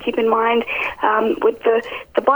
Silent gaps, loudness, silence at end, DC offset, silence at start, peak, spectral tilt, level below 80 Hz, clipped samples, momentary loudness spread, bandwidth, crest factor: none; -18 LUFS; 0 s; under 0.1%; 0 s; 0 dBFS; -5.5 dB/octave; -54 dBFS; under 0.1%; 5 LU; over 20 kHz; 16 dB